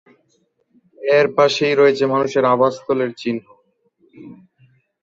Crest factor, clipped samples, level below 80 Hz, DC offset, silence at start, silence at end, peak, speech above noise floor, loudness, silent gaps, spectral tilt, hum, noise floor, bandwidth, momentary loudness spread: 18 dB; under 0.1%; -64 dBFS; under 0.1%; 1 s; 0.7 s; -2 dBFS; 47 dB; -17 LUFS; none; -5 dB/octave; none; -64 dBFS; 7.6 kHz; 11 LU